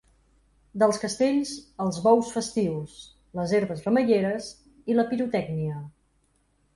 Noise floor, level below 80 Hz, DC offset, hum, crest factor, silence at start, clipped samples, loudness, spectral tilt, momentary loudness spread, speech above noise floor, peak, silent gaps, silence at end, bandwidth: -68 dBFS; -60 dBFS; under 0.1%; none; 20 dB; 0.75 s; under 0.1%; -25 LUFS; -6 dB/octave; 17 LU; 43 dB; -8 dBFS; none; 0.85 s; 11.5 kHz